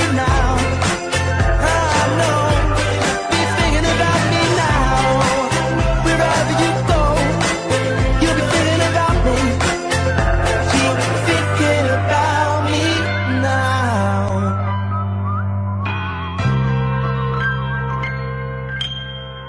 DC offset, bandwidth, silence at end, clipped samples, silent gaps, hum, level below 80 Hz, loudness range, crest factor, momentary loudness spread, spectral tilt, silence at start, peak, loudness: under 0.1%; 10.5 kHz; 0 s; under 0.1%; none; none; -26 dBFS; 4 LU; 12 dB; 6 LU; -5 dB/octave; 0 s; -4 dBFS; -17 LUFS